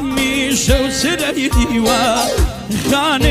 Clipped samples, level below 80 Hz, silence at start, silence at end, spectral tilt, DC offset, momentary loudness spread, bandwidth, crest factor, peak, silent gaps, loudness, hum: under 0.1%; -22 dBFS; 0 s; 0 s; -4 dB/octave; under 0.1%; 4 LU; 16 kHz; 14 dB; 0 dBFS; none; -15 LUFS; none